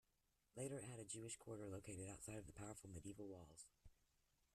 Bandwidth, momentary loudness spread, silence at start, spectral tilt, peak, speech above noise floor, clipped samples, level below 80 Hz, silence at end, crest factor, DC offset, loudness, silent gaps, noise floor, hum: 14 kHz; 10 LU; 0.55 s; -4.5 dB/octave; -38 dBFS; 31 dB; under 0.1%; -74 dBFS; 0.6 s; 18 dB; under 0.1%; -55 LUFS; none; -86 dBFS; none